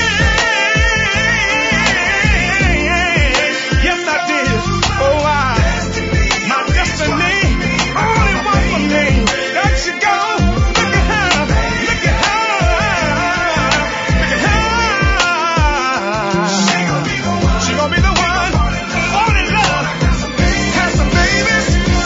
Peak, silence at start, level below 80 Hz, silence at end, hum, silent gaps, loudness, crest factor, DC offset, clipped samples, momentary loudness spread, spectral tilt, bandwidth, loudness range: 0 dBFS; 0 s; -22 dBFS; 0 s; none; none; -13 LUFS; 14 dB; under 0.1%; under 0.1%; 4 LU; -4 dB/octave; 7.8 kHz; 2 LU